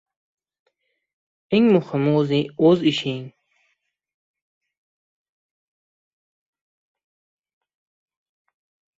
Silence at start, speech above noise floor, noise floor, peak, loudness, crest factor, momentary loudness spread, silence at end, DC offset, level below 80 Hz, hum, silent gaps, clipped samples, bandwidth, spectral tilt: 1.5 s; 54 dB; -72 dBFS; -6 dBFS; -19 LUFS; 20 dB; 9 LU; 5.7 s; under 0.1%; -66 dBFS; none; none; under 0.1%; 7.8 kHz; -7.5 dB/octave